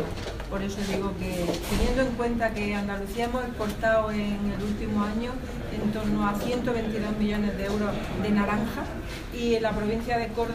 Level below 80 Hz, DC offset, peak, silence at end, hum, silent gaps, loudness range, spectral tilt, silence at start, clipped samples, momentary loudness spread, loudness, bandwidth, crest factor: -38 dBFS; under 0.1%; -12 dBFS; 0 s; none; none; 1 LU; -6 dB/octave; 0 s; under 0.1%; 7 LU; -28 LUFS; 15.5 kHz; 14 dB